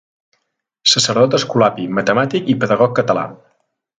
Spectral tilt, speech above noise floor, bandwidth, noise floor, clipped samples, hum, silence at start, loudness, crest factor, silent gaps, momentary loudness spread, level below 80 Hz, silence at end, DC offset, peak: -4 dB/octave; 55 dB; 9.6 kHz; -70 dBFS; under 0.1%; none; 0.85 s; -15 LUFS; 16 dB; none; 7 LU; -58 dBFS; 0.65 s; under 0.1%; 0 dBFS